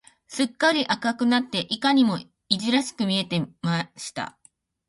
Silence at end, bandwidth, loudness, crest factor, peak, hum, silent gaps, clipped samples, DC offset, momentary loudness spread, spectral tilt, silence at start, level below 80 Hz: 0.6 s; 11.5 kHz; -24 LUFS; 22 dB; -4 dBFS; none; none; under 0.1%; under 0.1%; 12 LU; -4.5 dB/octave; 0.3 s; -66 dBFS